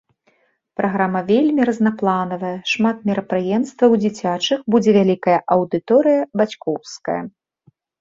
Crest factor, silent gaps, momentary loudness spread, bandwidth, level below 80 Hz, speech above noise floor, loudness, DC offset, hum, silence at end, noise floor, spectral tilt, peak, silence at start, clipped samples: 16 dB; none; 10 LU; 7.6 kHz; -62 dBFS; 45 dB; -18 LUFS; under 0.1%; none; 0.7 s; -62 dBFS; -6 dB/octave; -2 dBFS; 0.8 s; under 0.1%